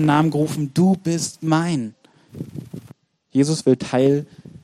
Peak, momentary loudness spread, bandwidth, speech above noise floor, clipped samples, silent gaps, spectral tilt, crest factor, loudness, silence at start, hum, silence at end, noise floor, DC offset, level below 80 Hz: -2 dBFS; 18 LU; 14.5 kHz; 30 dB; under 0.1%; none; -6 dB/octave; 18 dB; -20 LUFS; 0 s; none; 0.05 s; -49 dBFS; under 0.1%; -60 dBFS